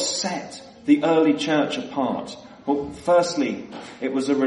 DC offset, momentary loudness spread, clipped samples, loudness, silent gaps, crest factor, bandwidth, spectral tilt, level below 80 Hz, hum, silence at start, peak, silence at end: under 0.1%; 15 LU; under 0.1%; -22 LUFS; none; 16 dB; 11.5 kHz; -4 dB/octave; -60 dBFS; none; 0 s; -6 dBFS; 0 s